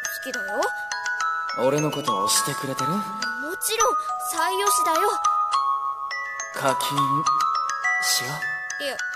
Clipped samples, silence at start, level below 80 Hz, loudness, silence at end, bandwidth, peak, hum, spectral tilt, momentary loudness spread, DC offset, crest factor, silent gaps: under 0.1%; 0 s; -66 dBFS; -23 LUFS; 0 s; 14.5 kHz; -6 dBFS; none; -2 dB/octave; 7 LU; under 0.1%; 18 dB; none